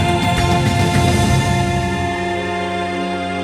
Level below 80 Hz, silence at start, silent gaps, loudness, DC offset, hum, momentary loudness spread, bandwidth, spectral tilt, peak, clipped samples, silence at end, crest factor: -30 dBFS; 0 s; none; -17 LUFS; under 0.1%; none; 6 LU; 16 kHz; -5.5 dB/octave; -2 dBFS; under 0.1%; 0 s; 14 dB